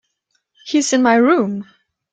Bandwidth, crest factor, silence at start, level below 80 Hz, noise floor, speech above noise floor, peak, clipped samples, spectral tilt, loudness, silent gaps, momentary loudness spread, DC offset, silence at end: 9.4 kHz; 16 dB; 0.65 s; -64 dBFS; -69 dBFS; 54 dB; -2 dBFS; under 0.1%; -4 dB/octave; -15 LUFS; none; 10 LU; under 0.1%; 0.5 s